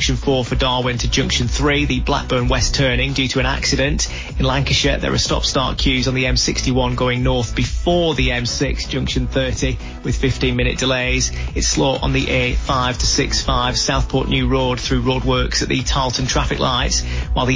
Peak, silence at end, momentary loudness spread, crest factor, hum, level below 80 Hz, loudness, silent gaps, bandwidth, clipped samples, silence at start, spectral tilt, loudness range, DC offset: -4 dBFS; 0 s; 4 LU; 12 dB; none; -24 dBFS; -18 LUFS; none; 7.6 kHz; under 0.1%; 0 s; -4 dB/octave; 2 LU; under 0.1%